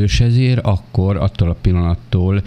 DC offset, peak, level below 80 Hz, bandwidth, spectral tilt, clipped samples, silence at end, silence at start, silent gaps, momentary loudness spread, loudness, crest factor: under 0.1%; -2 dBFS; -26 dBFS; 9 kHz; -7 dB/octave; under 0.1%; 0 s; 0 s; none; 4 LU; -16 LUFS; 14 dB